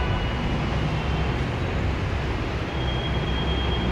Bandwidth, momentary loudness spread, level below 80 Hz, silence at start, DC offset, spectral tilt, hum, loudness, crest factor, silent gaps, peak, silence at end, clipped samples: 8.6 kHz; 2 LU; -30 dBFS; 0 s; under 0.1%; -6.5 dB/octave; none; -26 LUFS; 12 dB; none; -12 dBFS; 0 s; under 0.1%